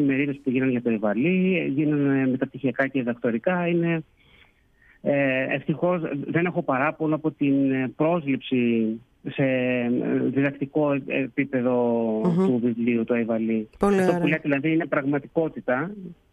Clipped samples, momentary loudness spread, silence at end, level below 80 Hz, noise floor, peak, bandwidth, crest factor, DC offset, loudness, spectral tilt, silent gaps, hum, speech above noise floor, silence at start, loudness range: under 0.1%; 5 LU; 0.2 s; -58 dBFS; -58 dBFS; -8 dBFS; 11.5 kHz; 16 dB; under 0.1%; -24 LUFS; -8.5 dB/octave; none; none; 35 dB; 0 s; 3 LU